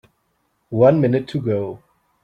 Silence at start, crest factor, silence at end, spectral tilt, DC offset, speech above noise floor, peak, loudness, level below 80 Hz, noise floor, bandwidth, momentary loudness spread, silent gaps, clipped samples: 0.7 s; 18 dB; 0.5 s; -9.5 dB/octave; under 0.1%; 51 dB; -2 dBFS; -18 LUFS; -56 dBFS; -68 dBFS; 8.6 kHz; 13 LU; none; under 0.1%